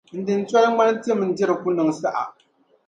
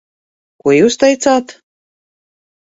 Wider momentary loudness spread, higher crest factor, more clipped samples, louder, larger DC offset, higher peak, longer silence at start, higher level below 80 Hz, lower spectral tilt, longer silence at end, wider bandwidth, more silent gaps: about the same, 8 LU vs 6 LU; about the same, 16 dB vs 16 dB; neither; second, -21 LUFS vs -12 LUFS; neither; second, -4 dBFS vs 0 dBFS; second, 0.15 s vs 0.65 s; second, -70 dBFS vs -56 dBFS; first, -6 dB/octave vs -4 dB/octave; second, 0.55 s vs 1.1 s; first, 9.2 kHz vs 8 kHz; neither